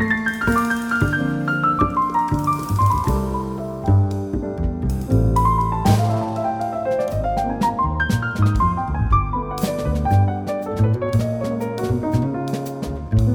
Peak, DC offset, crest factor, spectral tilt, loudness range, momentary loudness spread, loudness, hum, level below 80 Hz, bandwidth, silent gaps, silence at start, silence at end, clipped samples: -4 dBFS; under 0.1%; 16 dB; -7.5 dB/octave; 1 LU; 7 LU; -20 LUFS; none; -30 dBFS; 18 kHz; none; 0 s; 0 s; under 0.1%